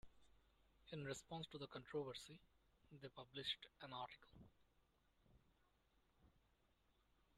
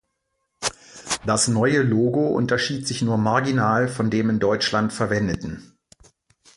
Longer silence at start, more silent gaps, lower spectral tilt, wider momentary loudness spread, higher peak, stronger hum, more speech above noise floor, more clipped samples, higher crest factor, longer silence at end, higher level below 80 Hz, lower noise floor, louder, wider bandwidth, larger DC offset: second, 0.05 s vs 0.6 s; neither; about the same, -4 dB/octave vs -4.5 dB/octave; first, 16 LU vs 9 LU; second, -34 dBFS vs -4 dBFS; neither; second, 28 dB vs 54 dB; neither; first, 24 dB vs 18 dB; about the same, 1 s vs 0.9 s; second, -78 dBFS vs -50 dBFS; first, -81 dBFS vs -75 dBFS; second, -53 LUFS vs -21 LUFS; first, 13 kHz vs 11.5 kHz; neither